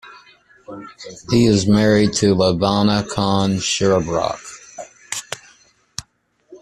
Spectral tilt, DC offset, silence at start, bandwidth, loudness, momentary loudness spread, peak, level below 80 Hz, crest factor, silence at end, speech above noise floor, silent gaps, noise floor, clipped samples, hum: -5 dB/octave; under 0.1%; 0.05 s; 12.5 kHz; -17 LUFS; 21 LU; -2 dBFS; -46 dBFS; 18 dB; 0.05 s; 44 dB; none; -60 dBFS; under 0.1%; none